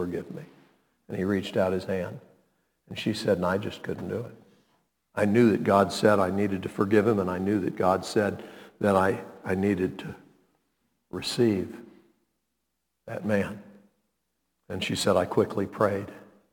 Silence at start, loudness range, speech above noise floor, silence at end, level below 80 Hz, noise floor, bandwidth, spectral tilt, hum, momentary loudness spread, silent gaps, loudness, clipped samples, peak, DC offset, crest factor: 0 s; 8 LU; 54 dB; 0.3 s; -64 dBFS; -80 dBFS; 19 kHz; -6 dB/octave; none; 18 LU; none; -26 LUFS; under 0.1%; -6 dBFS; under 0.1%; 22 dB